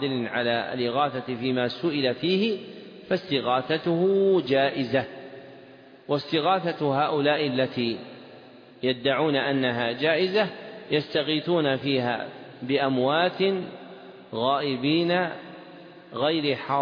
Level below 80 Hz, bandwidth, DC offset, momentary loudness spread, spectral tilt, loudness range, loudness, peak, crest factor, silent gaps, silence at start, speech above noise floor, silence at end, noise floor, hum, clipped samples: -68 dBFS; 5.2 kHz; under 0.1%; 17 LU; -7.5 dB/octave; 2 LU; -25 LUFS; -10 dBFS; 16 dB; none; 0 s; 24 dB; 0 s; -49 dBFS; none; under 0.1%